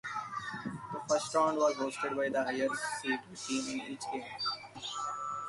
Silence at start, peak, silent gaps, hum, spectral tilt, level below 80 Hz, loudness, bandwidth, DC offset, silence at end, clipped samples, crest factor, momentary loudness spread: 0.05 s; -16 dBFS; none; none; -3 dB/octave; -74 dBFS; -35 LUFS; 11.5 kHz; under 0.1%; 0 s; under 0.1%; 18 dB; 10 LU